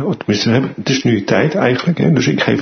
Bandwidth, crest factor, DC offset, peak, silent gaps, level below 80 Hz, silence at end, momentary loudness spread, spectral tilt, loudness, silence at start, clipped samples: 6.6 kHz; 14 dB; under 0.1%; 0 dBFS; none; -50 dBFS; 0 s; 3 LU; -6 dB/octave; -14 LUFS; 0 s; under 0.1%